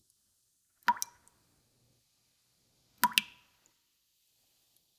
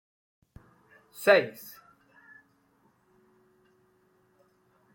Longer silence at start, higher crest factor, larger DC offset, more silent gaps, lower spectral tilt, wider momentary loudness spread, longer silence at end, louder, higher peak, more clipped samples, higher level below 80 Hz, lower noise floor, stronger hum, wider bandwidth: second, 0.9 s vs 1.2 s; first, 40 dB vs 28 dB; neither; neither; second, 0.5 dB/octave vs -4 dB/octave; second, 12 LU vs 28 LU; second, 1.75 s vs 3.45 s; second, -32 LUFS vs -25 LUFS; first, 0 dBFS vs -6 dBFS; neither; second, -82 dBFS vs -72 dBFS; first, -75 dBFS vs -68 dBFS; neither; about the same, 16 kHz vs 17 kHz